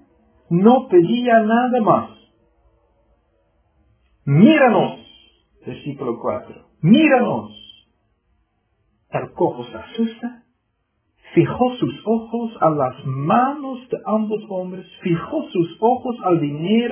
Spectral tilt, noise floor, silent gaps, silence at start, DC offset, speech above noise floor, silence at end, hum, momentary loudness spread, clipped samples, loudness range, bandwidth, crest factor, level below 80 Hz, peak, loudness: -11 dB/octave; -70 dBFS; none; 0.5 s; under 0.1%; 52 dB; 0 s; none; 17 LU; under 0.1%; 7 LU; 3.5 kHz; 20 dB; -58 dBFS; 0 dBFS; -18 LUFS